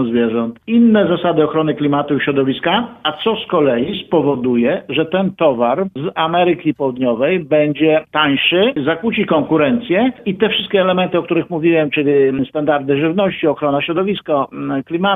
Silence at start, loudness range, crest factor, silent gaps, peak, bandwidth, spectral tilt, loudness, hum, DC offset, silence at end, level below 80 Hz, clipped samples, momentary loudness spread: 0 s; 2 LU; 14 dB; none; 0 dBFS; 4 kHz; -9.5 dB/octave; -15 LUFS; none; under 0.1%; 0 s; -54 dBFS; under 0.1%; 5 LU